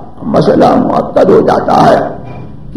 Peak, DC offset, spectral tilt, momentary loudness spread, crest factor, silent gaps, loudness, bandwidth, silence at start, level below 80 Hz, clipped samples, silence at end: 0 dBFS; 3%; -7.5 dB/octave; 17 LU; 10 dB; none; -8 LUFS; 13 kHz; 0 s; -36 dBFS; 2%; 0 s